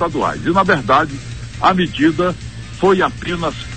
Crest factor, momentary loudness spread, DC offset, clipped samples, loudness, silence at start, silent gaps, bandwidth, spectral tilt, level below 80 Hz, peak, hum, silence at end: 16 dB; 13 LU; 0.7%; under 0.1%; -16 LUFS; 0 s; none; 9 kHz; -6 dB/octave; -38 dBFS; 0 dBFS; none; 0 s